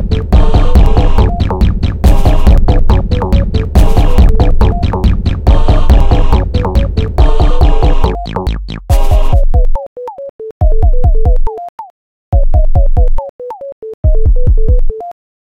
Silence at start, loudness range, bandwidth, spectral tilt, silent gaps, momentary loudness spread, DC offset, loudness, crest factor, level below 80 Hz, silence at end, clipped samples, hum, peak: 0 s; 4 LU; 6.4 kHz; -8 dB/octave; 9.87-9.96 s, 10.29-10.39 s, 10.51-10.60 s, 11.69-11.78 s, 11.90-12.32 s, 13.29-13.39 s, 13.72-13.82 s, 13.94-14.03 s; 13 LU; under 0.1%; -12 LUFS; 8 dB; -8 dBFS; 0.45 s; 2%; none; 0 dBFS